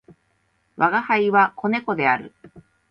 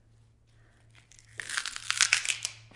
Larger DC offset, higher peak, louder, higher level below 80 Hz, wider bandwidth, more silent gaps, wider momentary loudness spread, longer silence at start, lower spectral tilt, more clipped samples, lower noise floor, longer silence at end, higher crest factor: neither; about the same, -4 dBFS vs -4 dBFS; first, -20 LUFS vs -28 LUFS; about the same, -66 dBFS vs -66 dBFS; second, 5.8 kHz vs 11.5 kHz; neither; second, 6 LU vs 16 LU; second, 0.8 s vs 1.35 s; first, -7.5 dB/octave vs 2.5 dB/octave; neither; first, -67 dBFS vs -61 dBFS; first, 0.3 s vs 0.05 s; second, 18 dB vs 30 dB